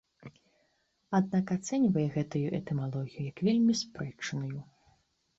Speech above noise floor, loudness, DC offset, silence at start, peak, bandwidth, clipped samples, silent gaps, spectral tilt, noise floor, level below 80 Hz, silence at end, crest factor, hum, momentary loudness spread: 44 dB; -31 LUFS; under 0.1%; 0.2 s; -18 dBFS; 8 kHz; under 0.1%; none; -6.5 dB/octave; -74 dBFS; -66 dBFS; 0.75 s; 14 dB; none; 11 LU